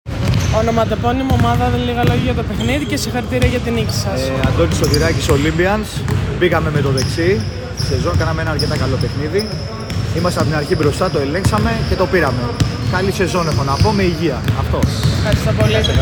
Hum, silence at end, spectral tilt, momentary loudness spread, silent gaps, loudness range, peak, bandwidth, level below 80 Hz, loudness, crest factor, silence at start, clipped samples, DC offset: none; 0 s; -6 dB/octave; 5 LU; none; 2 LU; 0 dBFS; 18 kHz; -28 dBFS; -16 LUFS; 14 dB; 0.05 s; under 0.1%; under 0.1%